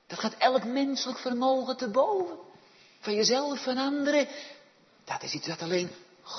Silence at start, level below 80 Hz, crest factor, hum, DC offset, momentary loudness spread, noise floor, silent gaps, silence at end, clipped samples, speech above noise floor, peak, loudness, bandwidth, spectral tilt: 0.1 s; -82 dBFS; 20 dB; none; under 0.1%; 13 LU; -58 dBFS; none; 0 s; under 0.1%; 30 dB; -10 dBFS; -29 LUFS; 6.4 kHz; -3.5 dB/octave